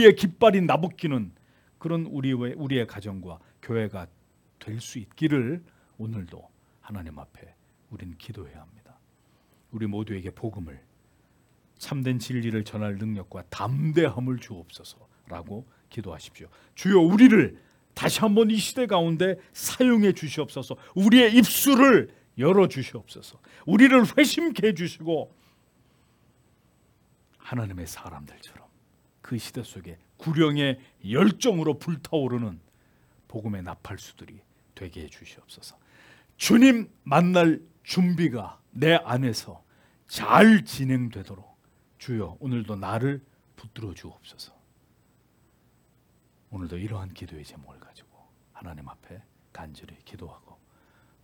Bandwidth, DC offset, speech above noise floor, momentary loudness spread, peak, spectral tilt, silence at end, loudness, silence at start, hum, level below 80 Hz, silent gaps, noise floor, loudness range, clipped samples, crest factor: 18 kHz; under 0.1%; 40 dB; 26 LU; -2 dBFS; -5.5 dB/octave; 0.95 s; -23 LUFS; 0 s; none; -62 dBFS; none; -64 dBFS; 21 LU; under 0.1%; 24 dB